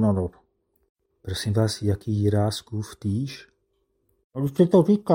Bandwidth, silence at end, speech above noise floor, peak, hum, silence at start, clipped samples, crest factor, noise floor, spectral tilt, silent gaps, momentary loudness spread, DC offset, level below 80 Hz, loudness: 16.5 kHz; 0 s; 49 dB; -6 dBFS; none; 0 s; under 0.1%; 18 dB; -72 dBFS; -7 dB/octave; 0.89-0.96 s, 4.24-4.31 s; 15 LU; under 0.1%; -56 dBFS; -24 LUFS